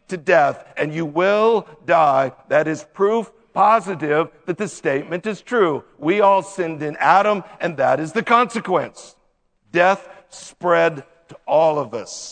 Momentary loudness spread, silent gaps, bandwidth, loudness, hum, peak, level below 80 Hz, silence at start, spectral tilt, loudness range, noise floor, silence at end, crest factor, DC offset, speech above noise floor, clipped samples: 10 LU; none; 9.4 kHz; -19 LUFS; none; 0 dBFS; -66 dBFS; 0.1 s; -5 dB/octave; 2 LU; -63 dBFS; 0 s; 20 dB; under 0.1%; 44 dB; under 0.1%